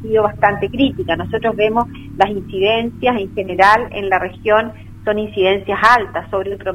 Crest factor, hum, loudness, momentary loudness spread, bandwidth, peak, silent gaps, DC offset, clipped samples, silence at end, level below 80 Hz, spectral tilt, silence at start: 16 dB; none; -16 LUFS; 10 LU; 16 kHz; 0 dBFS; none; under 0.1%; under 0.1%; 0 s; -40 dBFS; -6 dB/octave; 0 s